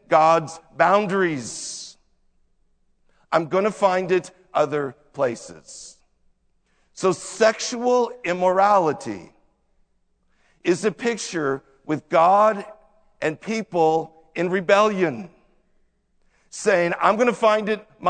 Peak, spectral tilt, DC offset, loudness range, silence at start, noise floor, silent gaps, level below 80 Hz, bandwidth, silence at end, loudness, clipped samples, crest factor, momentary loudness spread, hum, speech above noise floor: -2 dBFS; -4.5 dB/octave; under 0.1%; 4 LU; 0.1 s; -65 dBFS; none; -64 dBFS; 9.4 kHz; 0 s; -21 LUFS; under 0.1%; 20 dB; 16 LU; none; 45 dB